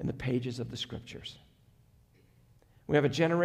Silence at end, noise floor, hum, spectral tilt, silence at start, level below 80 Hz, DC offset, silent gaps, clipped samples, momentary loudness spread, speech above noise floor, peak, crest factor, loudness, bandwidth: 0 s; -63 dBFS; none; -6.5 dB/octave; 0 s; -58 dBFS; under 0.1%; none; under 0.1%; 17 LU; 32 dB; -12 dBFS; 20 dB; -32 LUFS; 13.5 kHz